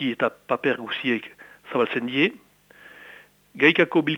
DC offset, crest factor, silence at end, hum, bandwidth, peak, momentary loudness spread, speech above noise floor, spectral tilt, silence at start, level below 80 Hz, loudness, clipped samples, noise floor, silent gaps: under 0.1%; 24 dB; 0 s; 50 Hz at -60 dBFS; 17 kHz; -2 dBFS; 11 LU; 28 dB; -6.5 dB/octave; 0 s; -72 dBFS; -23 LUFS; under 0.1%; -51 dBFS; none